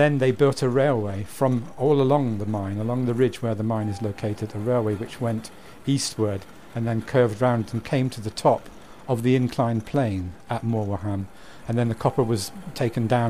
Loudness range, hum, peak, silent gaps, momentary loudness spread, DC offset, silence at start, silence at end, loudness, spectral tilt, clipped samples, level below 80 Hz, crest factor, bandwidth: 3 LU; none; -6 dBFS; none; 10 LU; 0.5%; 0 s; 0 s; -24 LUFS; -6.5 dB/octave; under 0.1%; -52 dBFS; 18 dB; 15.5 kHz